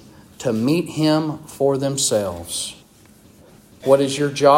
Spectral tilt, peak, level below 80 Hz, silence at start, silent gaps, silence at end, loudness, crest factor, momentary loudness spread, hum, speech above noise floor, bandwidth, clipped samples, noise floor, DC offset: -4.5 dB/octave; 0 dBFS; -58 dBFS; 0.4 s; none; 0 s; -20 LUFS; 20 dB; 10 LU; none; 31 dB; 16.5 kHz; under 0.1%; -49 dBFS; under 0.1%